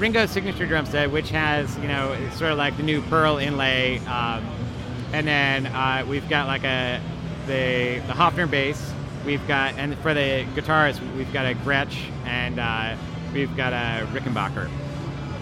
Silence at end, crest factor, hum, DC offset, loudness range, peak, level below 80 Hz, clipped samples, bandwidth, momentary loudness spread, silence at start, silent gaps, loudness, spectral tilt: 0 s; 20 dB; none; under 0.1%; 3 LU; -4 dBFS; -42 dBFS; under 0.1%; 15.5 kHz; 10 LU; 0 s; none; -24 LUFS; -5.5 dB/octave